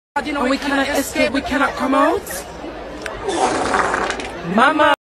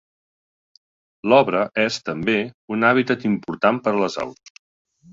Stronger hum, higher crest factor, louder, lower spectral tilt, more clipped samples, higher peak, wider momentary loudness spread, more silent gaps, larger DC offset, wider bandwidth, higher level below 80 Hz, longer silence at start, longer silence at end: neither; about the same, 18 dB vs 20 dB; about the same, -18 LUFS vs -20 LUFS; second, -3.5 dB/octave vs -5.5 dB/octave; neither; about the same, 0 dBFS vs -2 dBFS; first, 13 LU vs 10 LU; second, none vs 2.54-2.68 s; neither; first, 14 kHz vs 7.8 kHz; first, -42 dBFS vs -60 dBFS; second, 0.15 s vs 1.25 s; second, 0.2 s vs 0.8 s